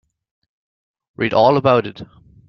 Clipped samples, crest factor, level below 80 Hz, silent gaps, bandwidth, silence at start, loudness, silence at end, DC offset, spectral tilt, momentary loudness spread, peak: under 0.1%; 18 dB; -56 dBFS; none; 6.4 kHz; 1.2 s; -16 LUFS; 0.45 s; under 0.1%; -7.5 dB/octave; 11 LU; -2 dBFS